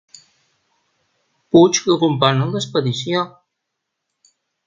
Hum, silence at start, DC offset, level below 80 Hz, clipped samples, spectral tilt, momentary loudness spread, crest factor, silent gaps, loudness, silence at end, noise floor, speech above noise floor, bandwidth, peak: none; 1.55 s; under 0.1%; -60 dBFS; under 0.1%; -5 dB/octave; 9 LU; 20 dB; none; -17 LUFS; 1.4 s; -78 dBFS; 62 dB; 7.6 kHz; 0 dBFS